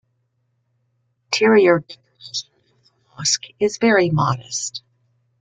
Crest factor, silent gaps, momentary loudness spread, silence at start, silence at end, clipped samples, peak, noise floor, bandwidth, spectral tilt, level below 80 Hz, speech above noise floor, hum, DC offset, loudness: 20 dB; none; 15 LU; 1.3 s; 0.65 s; under 0.1%; -2 dBFS; -69 dBFS; 9.6 kHz; -4 dB/octave; -60 dBFS; 51 dB; none; under 0.1%; -19 LUFS